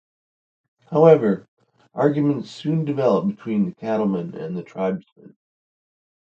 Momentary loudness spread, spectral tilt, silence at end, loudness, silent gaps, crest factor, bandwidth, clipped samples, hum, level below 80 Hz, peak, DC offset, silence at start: 15 LU; -9 dB/octave; 1 s; -21 LUFS; 1.48-1.57 s, 5.12-5.16 s; 22 dB; 7.6 kHz; under 0.1%; none; -66 dBFS; 0 dBFS; under 0.1%; 0.9 s